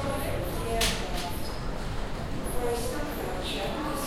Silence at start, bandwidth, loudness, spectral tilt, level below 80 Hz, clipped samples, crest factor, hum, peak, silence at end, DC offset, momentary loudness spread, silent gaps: 0 s; 16.5 kHz; -32 LUFS; -4 dB/octave; -36 dBFS; under 0.1%; 16 dB; none; -14 dBFS; 0 s; under 0.1%; 8 LU; none